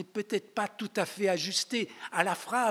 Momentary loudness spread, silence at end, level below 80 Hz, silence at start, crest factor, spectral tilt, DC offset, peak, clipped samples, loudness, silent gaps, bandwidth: 5 LU; 0 s; under -90 dBFS; 0 s; 24 dB; -3 dB/octave; under 0.1%; -8 dBFS; under 0.1%; -31 LUFS; none; 17 kHz